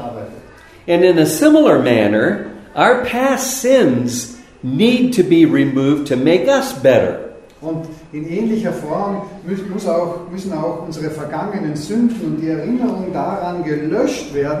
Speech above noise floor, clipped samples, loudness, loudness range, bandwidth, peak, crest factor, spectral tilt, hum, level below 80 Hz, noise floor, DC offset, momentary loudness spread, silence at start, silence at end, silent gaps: 24 dB; under 0.1%; -16 LUFS; 8 LU; 15.5 kHz; 0 dBFS; 16 dB; -5.5 dB/octave; none; -50 dBFS; -40 dBFS; under 0.1%; 14 LU; 0 s; 0 s; none